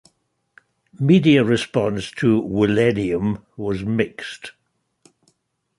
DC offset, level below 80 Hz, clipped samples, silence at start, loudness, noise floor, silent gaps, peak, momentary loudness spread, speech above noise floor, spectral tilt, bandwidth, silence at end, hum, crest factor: under 0.1%; -50 dBFS; under 0.1%; 1 s; -19 LUFS; -68 dBFS; none; -2 dBFS; 14 LU; 49 dB; -7 dB/octave; 11.5 kHz; 1.3 s; none; 18 dB